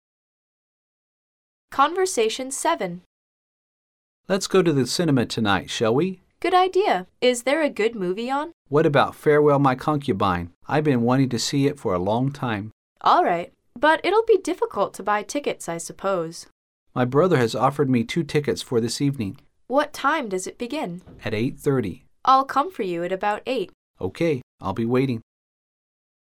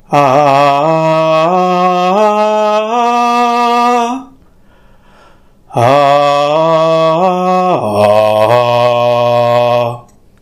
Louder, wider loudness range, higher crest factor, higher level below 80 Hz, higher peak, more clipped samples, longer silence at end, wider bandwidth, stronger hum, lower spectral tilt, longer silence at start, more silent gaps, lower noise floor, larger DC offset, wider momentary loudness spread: second, -22 LUFS vs -10 LUFS; about the same, 5 LU vs 3 LU; first, 20 dB vs 10 dB; second, -58 dBFS vs -52 dBFS; second, -4 dBFS vs 0 dBFS; second, under 0.1% vs 0.2%; first, 1 s vs 0.4 s; first, 16 kHz vs 14 kHz; neither; about the same, -5.5 dB/octave vs -6 dB/octave; first, 1.7 s vs 0.1 s; first, 3.06-4.24 s, 8.53-8.65 s, 10.55-10.61 s, 12.73-12.96 s, 16.52-16.86 s, 23.74-23.94 s, 24.43-24.58 s vs none; first, under -90 dBFS vs -43 dBFS; neither; first, 11 LU vs 4 LU